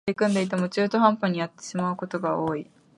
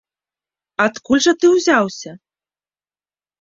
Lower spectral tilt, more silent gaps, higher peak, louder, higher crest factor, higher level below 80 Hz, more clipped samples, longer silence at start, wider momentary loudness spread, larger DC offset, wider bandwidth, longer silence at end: first, -6 dB/octave vs -3.5 dB/octave; neither; second, -6 dBFS vs -2 dBFS; second, -25 LUFS vs -15 LUFS; about the same, 20 dB vs 18 dB; second, -66 dBFS vs -60 dBFS; neither; second, 0.05 s vs 0.8 s; second, 9 LU vs 17 LU; neither; first, 11.5 kHz vs 7.6 kHz; second, 0.35 s vs 1.25 s